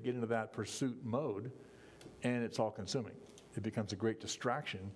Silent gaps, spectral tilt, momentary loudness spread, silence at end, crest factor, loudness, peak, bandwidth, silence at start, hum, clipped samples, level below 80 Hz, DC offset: none; -5 dB/octave; 16 LU; 0 s; 20 dB; -39 LUFS; -20 dBFS; 11 kHz; 0 s; none; under 0.1%; -74 dBFS; under 0.1%